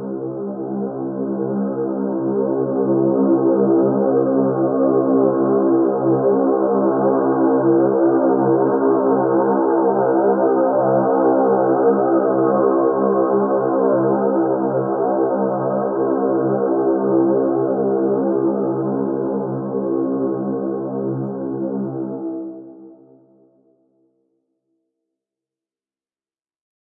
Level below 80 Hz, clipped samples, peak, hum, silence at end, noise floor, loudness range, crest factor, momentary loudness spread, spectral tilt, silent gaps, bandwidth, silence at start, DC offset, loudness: -66 dBFS; under 0.1%; -4 dBFS; none; 4 s; under -90 dBFS; 8 LU; 14 dB; 8 LU; -15.5 dB/octave; none; 1.8 kHz; 0 s; under 0.1%; -18 LUFS